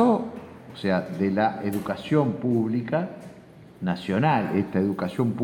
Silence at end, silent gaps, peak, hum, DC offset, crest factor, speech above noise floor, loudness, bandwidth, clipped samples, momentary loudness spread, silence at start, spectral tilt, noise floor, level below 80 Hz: 0 s; none; -8 dBFS; none; under 0.1%; 16 dB; 23 dB; -25 LUFS; 17 kHz; under 0.1%; 13 LU; 0 s; -8 dB/octave; -47 dBFS; -62 dBFS